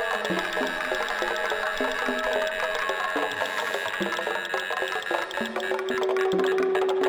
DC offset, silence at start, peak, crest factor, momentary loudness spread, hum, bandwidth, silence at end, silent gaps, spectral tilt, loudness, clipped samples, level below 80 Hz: under 0.1%; 0 s; -10 dBFS; 16 dB; 4 LU; none; over 20 kHz; 0 s; none; -3 dB/octave; -26 LUFS; under 0.1%; -58 dBFS